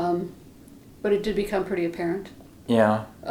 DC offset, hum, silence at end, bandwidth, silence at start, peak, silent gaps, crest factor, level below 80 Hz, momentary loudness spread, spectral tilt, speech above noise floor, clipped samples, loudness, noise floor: under 0.1%; none; 0 s; 19.5 kHz; 0 s; -6 dBFS; none; 20 dB; -50 dBFS; 15 LU; -7 dB/octave; 24 dB; under 0.1%; -25 LUFS; -48 dBFS